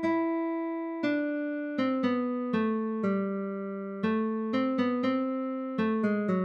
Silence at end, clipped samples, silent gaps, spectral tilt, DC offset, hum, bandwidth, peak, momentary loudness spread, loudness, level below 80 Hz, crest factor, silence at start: 0 s; under 0.1%; none; -8.5 dB/octave; under 0.1%; none; 6.8 kHz; -16 dBFS; 5 LU; -30 LUFS; -74 dBFS; 14 dB; 0 s